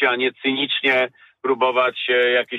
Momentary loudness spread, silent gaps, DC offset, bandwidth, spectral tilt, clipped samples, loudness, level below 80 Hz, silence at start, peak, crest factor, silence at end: 7 LU; none; under 0.1%; 6.8 kHz; -5 dB/octave; under 0.1%; -19 LUFS; -72 dBFS; 0 s; -6 dBFS; 14 dB; 0 s